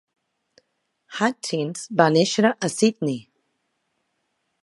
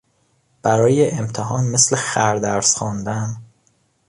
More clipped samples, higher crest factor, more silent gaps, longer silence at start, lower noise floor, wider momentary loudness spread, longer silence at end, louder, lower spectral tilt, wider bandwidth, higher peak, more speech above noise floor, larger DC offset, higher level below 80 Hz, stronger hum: neither; first, 24 dB vs 18 dB; neither; first, 1.1 s vs 0.65 s; first, -74 dBFS vs -63 dBFS; about the same, 10 LU vs 10 LU; first, 1.4 s vs 0.65 s; second, -21 LUFS vs -18 LUFS; about the same, -4.5 dB/octave vs -4 dB/octave; about the same, 11.5 kHz vs 11.5 kHz; about the same, 0 dBFS vs -2 dBFS; first, 53 dB vs 45 dB; neither; second, -74 dBFS vs -52 dBFS; neither